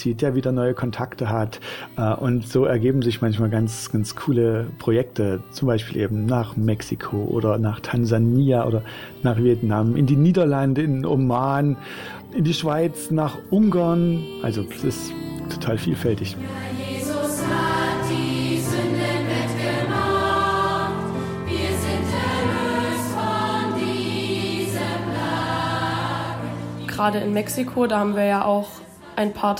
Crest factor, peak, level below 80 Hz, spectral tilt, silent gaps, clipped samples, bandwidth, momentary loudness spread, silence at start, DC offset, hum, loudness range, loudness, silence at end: 16 dB; -6 dBFS; -48 dBFS; -6.5 dB/octave; none; under 0.1%; 17 kHz; 8 LU; 0 s; under 0.1%; none; 4 LU; -22 LUFS; 0 s